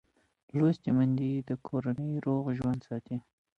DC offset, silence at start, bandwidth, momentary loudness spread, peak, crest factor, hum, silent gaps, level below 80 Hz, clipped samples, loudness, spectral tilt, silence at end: under 0.1%; 0.55 s; 6.8 kHz; 10 LU; -16 dBFS; 16 dB; none; none; -64 dBFS; under 0.1%; -31 LUFS; -10 dB/octave; 0.4 s